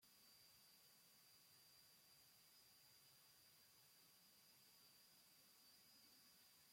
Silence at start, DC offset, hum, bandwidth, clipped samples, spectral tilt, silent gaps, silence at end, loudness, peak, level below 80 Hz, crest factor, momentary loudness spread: 0 s; under 0.1%; none; 16.5 kHz; under 0.1%; -0.5 dB/octave; none; 0 s; -69 LUFS; -58 dBFS; under -90 dBFS; 14 dB; 1 LU